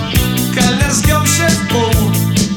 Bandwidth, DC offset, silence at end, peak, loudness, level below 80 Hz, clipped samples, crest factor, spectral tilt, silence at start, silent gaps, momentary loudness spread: over 20 kHz; under 0.1%; 0 s; 0 dBFS; -12 LUFS; -24 dBFS; under 0.1%; 12 dB; -4 dB/octave; 0 s; none; 2 LU